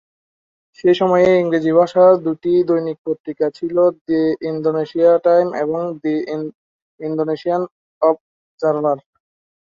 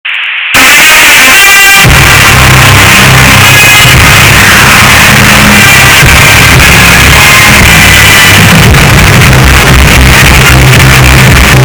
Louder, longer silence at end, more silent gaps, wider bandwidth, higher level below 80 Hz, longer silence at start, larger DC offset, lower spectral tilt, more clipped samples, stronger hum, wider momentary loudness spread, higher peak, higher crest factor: second, -17 LUFS vs 1 LUFS; first, 0.65 s vs 0 s; first, 2.98-3.05 s, 3.20-3.24 s, 4.01-4.05 s, 6.55-6.98 s, 7.71-8.01 s, 8.21-8.58 s vs none; second, 7.2 kHz vs over 20 kHz; second, -62 dBFS vs -12 dBFS; first, 0.85 s vs 0.05 s; neither; first, -8 dB/octave vs -3 dB/octave; second, under 0.1% vs 80%; neither; first, 12 LU vs 3 LU; about the same, -2 dBFS vs 0 dBFS; first, 16 dB vs 0 dB